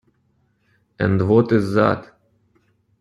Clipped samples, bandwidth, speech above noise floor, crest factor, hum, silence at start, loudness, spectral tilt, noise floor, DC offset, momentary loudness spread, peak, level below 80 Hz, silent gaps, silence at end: under 0.1%; 11 kHz; 47 dB; 18 dB; none; 1 s; -18 LUFS; -8.5 dB/octave; -64 dBFS; under 0.1%; 8 LU; -2 dBFS; -52 dBFS; none; 0.95 s